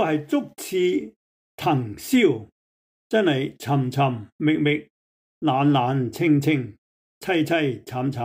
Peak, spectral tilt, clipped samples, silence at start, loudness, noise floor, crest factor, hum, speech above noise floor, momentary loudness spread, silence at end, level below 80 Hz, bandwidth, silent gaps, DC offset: -8 dBFS; -6.5 dB/octave; under 0.1%; 0 s; -23 LUFS; under -90 dBFS; 16 dB; none; over 68 dB; 8 LU; 0 s; -64 dBFS; 16 kHz; 1.16-1.58 s, 2.52-3.10 s, 4.32-4.39 s, 4.90-5.41 s, 6.78-7.21 s; under 0.1%